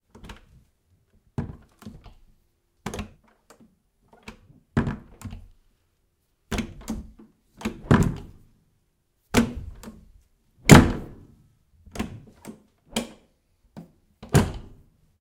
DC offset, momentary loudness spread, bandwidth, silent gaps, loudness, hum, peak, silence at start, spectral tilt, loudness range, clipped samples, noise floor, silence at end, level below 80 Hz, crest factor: under 0.1%; 25 LU; 16.5 kHz; none; -23 LUFS; none; 0 dBFS; 0.25 s; -5.5 dB/octave; 19 LU; under 0.1%; -70 dBFS; 0.6 s; -40 dBFS; 28 dB